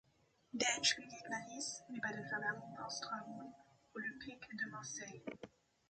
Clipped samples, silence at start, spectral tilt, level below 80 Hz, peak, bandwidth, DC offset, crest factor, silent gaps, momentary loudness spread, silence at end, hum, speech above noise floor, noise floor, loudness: under 0.1%; 0.55 s; -1.5 dB/octave; -80 dBFS; -20 dBFS; 9 kHz; under 0.1%; 24 dB; none; 17 LU; 0.4 s; none; 27 dB; -71 dBFS; -42 LUFS